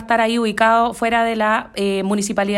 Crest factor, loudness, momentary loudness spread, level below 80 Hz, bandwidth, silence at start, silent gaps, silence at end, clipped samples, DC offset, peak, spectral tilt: 14 dB; -17 LUFS; 5 LU; -50 dBFS; 15 kHz; 0 s; none; 0 s; under 0.1%; under 0.1%; -4 dBFS; -4.5 dB/octave